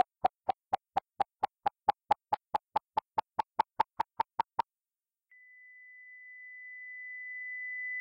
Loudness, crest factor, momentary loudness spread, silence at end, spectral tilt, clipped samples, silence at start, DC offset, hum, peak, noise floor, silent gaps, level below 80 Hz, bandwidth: -36 LUFS; 24 dB; 16 LU; 0 s; -4.5 dB/octave; under 0.1%; 0.25 s; under 0.1%; none; -14 dBFS; under -90 dBFS; none; -72 dBFS; 9.8 kHz